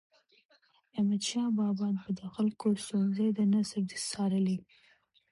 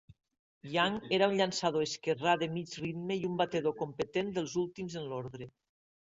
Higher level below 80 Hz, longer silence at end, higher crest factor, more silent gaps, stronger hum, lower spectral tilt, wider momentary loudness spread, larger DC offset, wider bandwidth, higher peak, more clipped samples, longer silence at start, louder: about the same, -72 dBFS vs -70 dBFS; first, 0.7 s vs 0.55 s; second, 12 dB vs 20 dB; second, none vs 0.39-0.61 s; neither; about the same, -5.5 dB/octave vs -4.5 dB/octave; second, 6 LU vs 11 LU; neither; first, 11.5 kHz vs 8 kHz; second, -20 dBFS vs -14 dBFS; neither; first, 0.95 s vs 0.1 s; about the same, -31 LUFS vs -33 LUFS